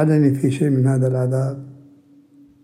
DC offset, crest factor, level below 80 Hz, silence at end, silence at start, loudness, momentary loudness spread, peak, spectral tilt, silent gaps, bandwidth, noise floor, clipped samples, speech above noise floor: under 0.1%; 14 dB; -64 dBFS; 0.9 s; 0 s; -19 LUFS; 8 LU; -4 dBFS; -9 dB/octave; none; 11 kHz; -50 dBFS; under 0.1%; 33 dB